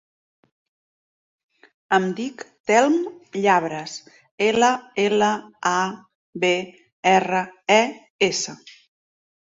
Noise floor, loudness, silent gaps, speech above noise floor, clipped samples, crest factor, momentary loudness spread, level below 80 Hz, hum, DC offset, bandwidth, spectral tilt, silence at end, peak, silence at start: under -90 dBFS; -21 LUFS; 2.60-2.64 s, 4.31-4.38 s, 6.15-6.33 s, 6.92-7.03 s, 8.10-8.19 s; over 69 dB; under 0.1%; 20 dB; 14 LU; -68 dBFS; none; under 0.1%; 7.8 kHz; -3.5 dB/octave; 0.85 s; -4 dBFS; 1.9 s